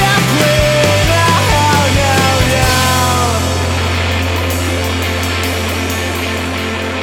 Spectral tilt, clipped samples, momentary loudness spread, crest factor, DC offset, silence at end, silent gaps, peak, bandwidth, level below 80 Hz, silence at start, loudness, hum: -4 dB/octave; under 0.1%; 6 LU; 12 dB; under 0.1%; 0 s; none; 0 dBFS; 17.5 kHz; -26 dBFS; 0 s; -13 LUFS; none